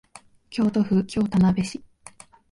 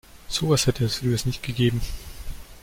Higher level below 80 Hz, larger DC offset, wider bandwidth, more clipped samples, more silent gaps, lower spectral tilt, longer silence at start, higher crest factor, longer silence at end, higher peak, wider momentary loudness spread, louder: second, -50 dBFS vs -38 dBFS; neither; second, 11.5 kHz vs 16.5 kHz; neither; neither; first, -7 dB/octave vs -5 dB/octave; first, 0.5 s vs 0.15 s; about the same, 14 dB vs 16 dB; first, 0.75 s vs 0.05 s; about the same, -10 dBFS vs -8 dBFS; second, 12 LU vs 19 LU; about the same, -23 LUFS vs -24 LUFS